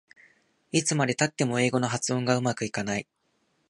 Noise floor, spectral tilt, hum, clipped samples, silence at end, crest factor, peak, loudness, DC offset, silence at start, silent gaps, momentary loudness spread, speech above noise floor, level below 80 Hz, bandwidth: -72 dBFS; -4.5 dB/octave; none; under 0.1%; 0.65 s; 20 dB; -8 dBFS; -27 LUFS; under 0.1%; 0.75 s; none; 6 LU; 45 dB; -66 dBFS; 11.5 kHz